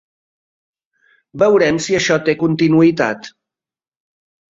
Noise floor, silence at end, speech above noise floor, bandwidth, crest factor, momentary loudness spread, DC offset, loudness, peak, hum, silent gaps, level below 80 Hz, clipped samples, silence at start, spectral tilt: under -90 dBFS; 1.25 s; over 76 dB; 7.8 kHz; 16 dB; 7 LU; under 0.1%; -14 LUFS; -2 dBFS; none; none; -54 dBFS; under 0.1%; 1.35 s; -5.5 dB/octave